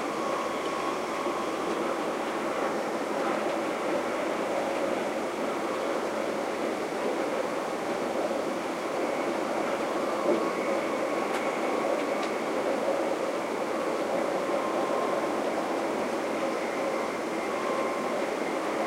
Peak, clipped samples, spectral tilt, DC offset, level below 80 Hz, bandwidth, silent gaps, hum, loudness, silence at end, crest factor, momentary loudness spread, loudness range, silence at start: -12 dBFS; under 0.1%; -4 dB/octave; under 0.1%; -68 dBFS; 16.5 kHz; none; none; -29 LUFS; 0 s; 16 dB; 2 LU; 2 LU; 0 s